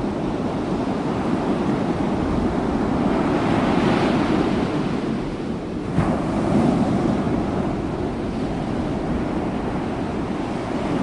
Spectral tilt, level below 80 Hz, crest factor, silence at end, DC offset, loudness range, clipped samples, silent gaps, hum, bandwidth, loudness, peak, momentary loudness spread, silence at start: -7.5 dB/octave; -38 dBFS; 16 dB; 0 s; under 0.1%; 4 LU; under 0.1%; none; none; 11 kHz; -22 LUFS; -6 dBFS; 6 LU; 0 s